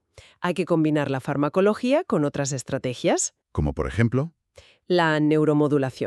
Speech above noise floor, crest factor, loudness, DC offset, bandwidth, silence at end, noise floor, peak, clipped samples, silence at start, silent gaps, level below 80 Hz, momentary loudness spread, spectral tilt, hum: 32 dB; 16 dB; -23 LUFS; under 0.1%; 12 kHz; 0 s; -54 dBFS; -6 dBFS; under 0.1%; 0.4 s; none; -44 dBFS; 8 LU; -5.5 dB/octave; none